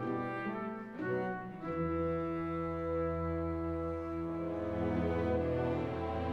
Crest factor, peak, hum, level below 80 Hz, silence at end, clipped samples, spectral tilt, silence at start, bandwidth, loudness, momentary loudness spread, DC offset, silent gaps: 14 dB; -22 dBFS; none; -50 dBFS; 0 s; under 0.1%; -9.5 dB/octave; 0 s; 6.4 kHz; -36 LUFS; 6 LU; under 0.1%; none